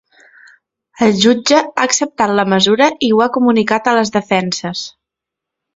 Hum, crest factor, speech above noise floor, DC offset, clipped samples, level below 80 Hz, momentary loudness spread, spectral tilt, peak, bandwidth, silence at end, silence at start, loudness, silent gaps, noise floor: none; 14 dB; 69 dB; under 0.1%; under 0.1%; -56 dBFS; 8 LU; -3.5 dB/octave; 0 dBFS; 8 kHz; 0.85 s; 1 s; -13 LUFS; none; -82 dBFS